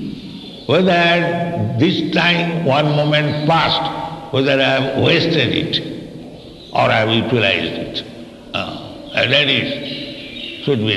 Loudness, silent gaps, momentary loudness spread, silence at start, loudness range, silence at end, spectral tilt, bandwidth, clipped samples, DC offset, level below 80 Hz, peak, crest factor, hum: -16 LUFS; none; 16 LU; 0 s; 4 LU; 0 s; -6 dB/octave; 12 kHz; under 0.1%; under 0.1%; -48 dBFS; 0 dBFS; 18 dB; none